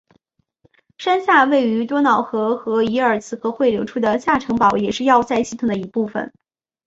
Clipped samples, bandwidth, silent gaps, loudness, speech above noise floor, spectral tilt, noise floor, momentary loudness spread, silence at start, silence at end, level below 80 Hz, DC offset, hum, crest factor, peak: under 0.1%; 8 kHz; none; -18 LUFS; 46 dB; -5 dB/octave; -64 dBFS; 9 LU; 1 s; 0.6 s; -54 dBFS; under 0.1%; none; 16 dB; -2 dBFS